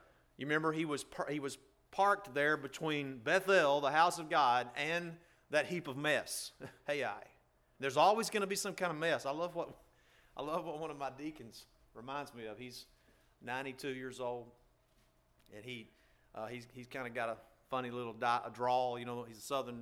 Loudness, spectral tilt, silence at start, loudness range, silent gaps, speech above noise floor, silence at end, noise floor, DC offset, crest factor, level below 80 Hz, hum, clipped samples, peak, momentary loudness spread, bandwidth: -36 LUFS; -4 dB/octave; 0.4 s; 13 LU; none; 35 dB; 0 s; -72 dBFS; under 0.1%; 22 dB; -74 dBFS; none; under 0.1%; -16 dBFS; 17 LU; 17.5 kHz